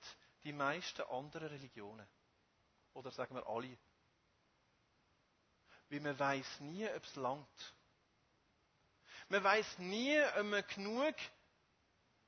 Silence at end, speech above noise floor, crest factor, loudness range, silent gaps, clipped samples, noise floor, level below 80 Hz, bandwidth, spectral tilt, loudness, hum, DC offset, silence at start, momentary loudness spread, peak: 1 s; 37 dB; 24 dB; 13 LU; none; under 0.1%; -78 dBFS; -82 dBFS; 6.4 kHz; -2.5 dB/octave; -40 LUFS; none; under 0.1%; 0 s; 21 LU; -20 dBFS